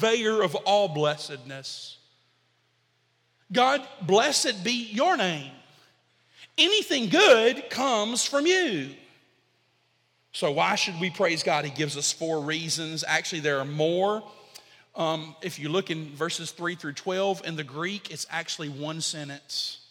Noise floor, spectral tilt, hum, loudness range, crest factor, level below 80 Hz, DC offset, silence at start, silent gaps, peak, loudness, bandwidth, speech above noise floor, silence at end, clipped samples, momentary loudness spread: -69 dBFS; -3 dB/octave; none; 8 LU; 24 dB; -78 dBFS; under 0.1%; 0 s; none; -4 dBFS; -25 LUFS; 16.5 kHz; 43 dB; 0.1 s; under 0.1%; 13 LU